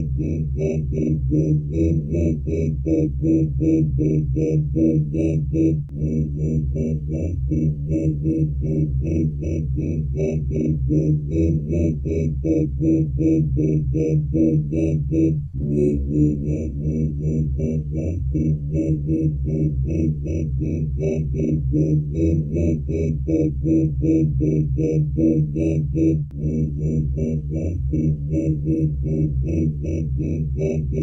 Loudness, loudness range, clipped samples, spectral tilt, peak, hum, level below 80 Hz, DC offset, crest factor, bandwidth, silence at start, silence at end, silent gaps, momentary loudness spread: -21 LUFS; 2 LU; under 0.1%; -11 dB/octave; -6 dBFS; none; -30 dBFS; under 0.1%; 14 dB; 6.4 kHz; 0 s; 0 s; none; 5 LU